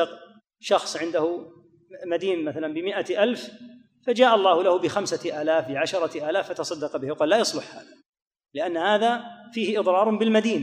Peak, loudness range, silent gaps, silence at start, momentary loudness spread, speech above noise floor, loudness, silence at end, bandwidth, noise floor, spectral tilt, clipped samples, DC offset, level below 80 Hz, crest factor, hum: -4 dBFS; 4 LU; 8.09-8.13 s, 8.22-8.31 s; 0 s; 13 LU; 23 dB; -24 LUFS; 0 s; 14.5 kHz; -47 dBFS; -4 dB/octave; under 0.1%; under 0.1%; -76 dBFS; 20 dB; none